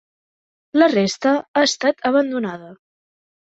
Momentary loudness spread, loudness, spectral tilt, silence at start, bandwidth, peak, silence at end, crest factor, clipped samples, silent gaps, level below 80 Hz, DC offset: 9 LU; -18 LUFS; -4 dB/octave; 0.75 s; 8 kHz; -2 dBFS; 0.75 s; 18 dB; under 0.1%; 1.48-1.54 s; -66 dBFS; under 0.1%